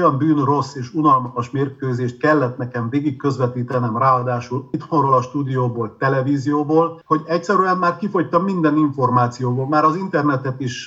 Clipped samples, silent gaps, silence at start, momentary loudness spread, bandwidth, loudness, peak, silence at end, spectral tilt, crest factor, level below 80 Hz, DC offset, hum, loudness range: under 0.1%; none; 0 s; 7 LU; 7.8 kHz; -19 LUFS; -4 dBFS; 0 s; -7.5 dB/octave; 14 dB; -64 dBFS; under 0.1%; none; 2 LU